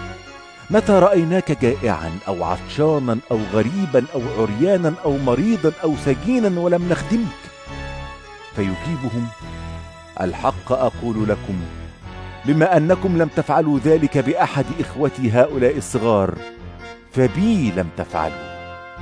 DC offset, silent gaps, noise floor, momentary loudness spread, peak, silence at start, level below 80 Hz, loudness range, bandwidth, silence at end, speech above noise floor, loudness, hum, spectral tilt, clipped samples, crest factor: under 0.1%; none; -39 dBFS; 18 LU; -2 dBFS; 0 s; -40 dBFS; 6 LU; 11 kHz; 0 s; 21 dB; -19 LUFS; none; -7 dB/octave; under 0.1%; 18 dB